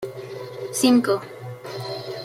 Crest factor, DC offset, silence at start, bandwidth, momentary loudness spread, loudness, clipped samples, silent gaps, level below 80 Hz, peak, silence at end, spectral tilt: 20 dB; under 0.1%; 0 s; 15.5 kHz; 18 LU; -22 LUFS; under 0.1%; none; -66 dBFS; -4 dBFS; 0 s; -4.5 dB/octave